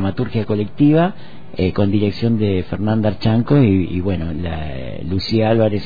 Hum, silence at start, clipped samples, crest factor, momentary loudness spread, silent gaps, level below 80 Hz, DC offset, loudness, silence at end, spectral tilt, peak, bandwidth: none; 0 s; under 0.1%; 14 dB; 11 LU; none; -38 dBFS; 3%; -18 LUFS; 0 s; -9.5 dB/octave; -4 dBFS; 5 kHz